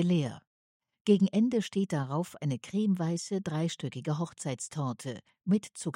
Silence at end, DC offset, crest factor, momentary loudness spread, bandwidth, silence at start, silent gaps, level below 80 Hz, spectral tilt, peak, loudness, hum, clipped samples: 0 s; under 0.1%; 18 dB; 10 LU; 12 kHz; 0 s; 0.47-0.80 s, 1.01-1.05 s; -74 dBFS; -6.5 dB/octave; -12 dBFS; -31 LUFS; none; under 0.1%